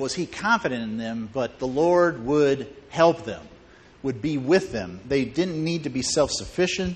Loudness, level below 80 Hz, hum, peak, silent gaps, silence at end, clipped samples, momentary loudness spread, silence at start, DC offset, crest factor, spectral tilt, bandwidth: -24 LUFS; -50 dBFS; none; -4 dBFS; none; 0 s; under 0.1%; 11 LU; 0 s; under 0.1%; 20 dB; -4.5 dB/octave; 9.4 kHz